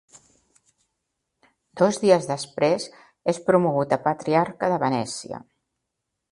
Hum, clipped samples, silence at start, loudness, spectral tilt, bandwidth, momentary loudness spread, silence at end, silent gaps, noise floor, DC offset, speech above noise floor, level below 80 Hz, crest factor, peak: none; under 0.1%; 1.75 s; -23 LUFS; -5.5 dB/octave; 11.5 kHz; 12 LU; 0.95 s; none; -81 dBFS; under 0.1%; 59 dB; -66 dBFS; 22 dB; -4 dBFS